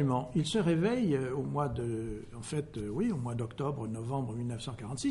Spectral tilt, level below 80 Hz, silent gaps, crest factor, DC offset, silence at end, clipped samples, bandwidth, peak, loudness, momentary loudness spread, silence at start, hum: -6.5 dB/octave; -54 dBFS; none; 14 dB; under 0.1%; 0 s; under 0.1%; 11.5 kHz; -18 dBFS; -34 LUFS; 9 LU; 0 s; none